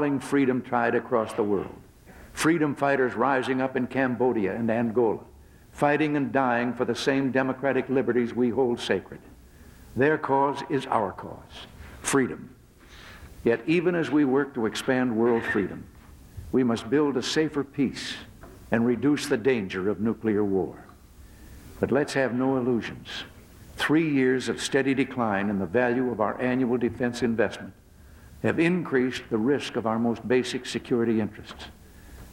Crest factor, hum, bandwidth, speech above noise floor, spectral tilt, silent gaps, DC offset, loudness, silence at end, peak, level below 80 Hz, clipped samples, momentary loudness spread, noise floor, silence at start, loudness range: 20 dB; none; 16.5 kHz; 25 dB; -5.5 dB/octave; none; under 0.1%; -26 LUFS; 0 s; -6 dBFS; -54 dBFS; under 0.1%; 13 LU; -50 dBFS; 0 s; 3 LU